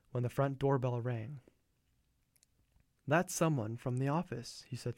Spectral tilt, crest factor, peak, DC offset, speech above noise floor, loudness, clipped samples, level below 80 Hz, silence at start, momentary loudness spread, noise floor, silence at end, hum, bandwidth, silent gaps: -6 dB/octave; 20 dB; -18 dBFS; under 0.1%; 41 dB; -36 LUFS; under 0.1%; -66 dBFS; 0.15 s; 13 LU; -76 dBFS; 0.05 s; none; 16.5 kHz; none